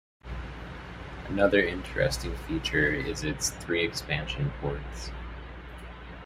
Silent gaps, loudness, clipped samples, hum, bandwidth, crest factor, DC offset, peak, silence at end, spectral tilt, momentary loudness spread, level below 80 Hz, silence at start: none; -29 LUFS; under 0.1%; none; 15.5 kHz; 24 dB; under 0.1%; -8 dBFS; 0 s; -4 dB/octave; 17 LU; -42 dBFS; 0.25 s